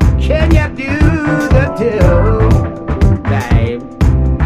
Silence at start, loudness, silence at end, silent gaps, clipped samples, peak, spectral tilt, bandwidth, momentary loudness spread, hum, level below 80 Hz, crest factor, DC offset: 0 s; -13 LUFS; 0 s; none; under 0.1%; 0 dBFS; -8 dB/octave; 12.5 kHz; 4 LU; none; -16 dBFS; 10 dB; under 0.1%